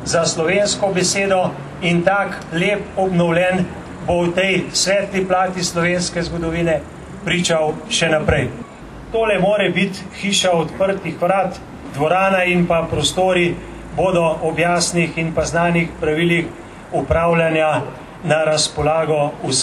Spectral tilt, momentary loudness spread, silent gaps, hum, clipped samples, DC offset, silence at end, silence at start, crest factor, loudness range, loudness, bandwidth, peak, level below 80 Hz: -4 dB/octave; 9 LU; none; none; under 0.1%; under 0.1%; 0 s; 0 s; 16 dB; 1 LU; -17 LUFS; 13 kHz; -2 dBFS; -40 dBFS